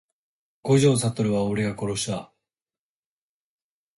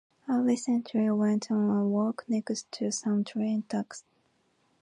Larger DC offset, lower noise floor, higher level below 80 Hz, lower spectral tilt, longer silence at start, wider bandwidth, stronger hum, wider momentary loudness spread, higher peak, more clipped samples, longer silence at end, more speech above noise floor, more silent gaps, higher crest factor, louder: neither; first, under -90 dBFS vs -71 dBFS; first, -58 dBFS vs -78 dBFS; about the same, -5.5 dB/octave vs -5.5 dB/octave; first, 0.65 s vs 0.25 s; about the same, 11.5 kHz vs 11 kHz; neither; first, 12 LU vs 8 LU; first, -8 dBFS vs -14 dBFS; neither; first, 1.7 s vs 0.8 s; first, over 68 dB vs 42 dB; neither; about the same, 18 dB vs 14 dB; first, -23 LUFS vs -29 LUFS